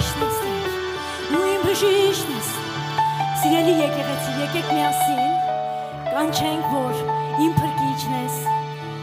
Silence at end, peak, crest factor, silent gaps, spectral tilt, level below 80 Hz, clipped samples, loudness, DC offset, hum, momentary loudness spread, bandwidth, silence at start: 0 s; -4 dBFS; 16 dB; none; -4.5 dB/octave; -50 dBFS; under 0.1%; -22 LUFS; under 0.1%; none; 8 LU; 16 kHz; 0 s